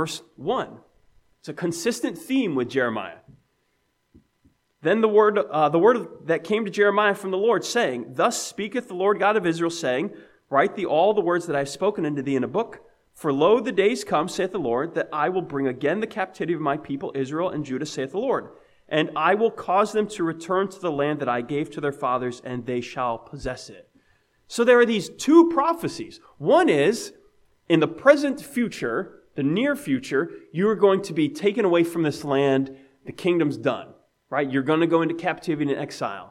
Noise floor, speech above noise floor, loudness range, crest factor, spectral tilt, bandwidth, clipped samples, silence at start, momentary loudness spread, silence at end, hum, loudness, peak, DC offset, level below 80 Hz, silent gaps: -70 dBFS; 48 dB; 6 LU; 22 dB; -5.5 dB/octave; 15.5 kHz; under 0.1%; 0 s; 12 LU; 0.05 s; none; -23 LUFS; -2 dBFS; under 0.1%; -60 dBFS; none